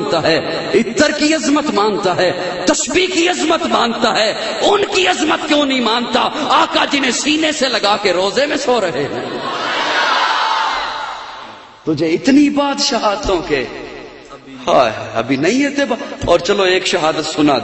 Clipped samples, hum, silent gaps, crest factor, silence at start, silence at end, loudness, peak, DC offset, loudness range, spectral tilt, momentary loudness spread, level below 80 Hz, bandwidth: under 0.1%; none; none; 16 dB; 0 s; 0 s; -14 LUFS; 0 dBFS; under 0.1%; 3 LU; -3 dB/octave; 9 LU; -44 dBFS; 8.4 kHz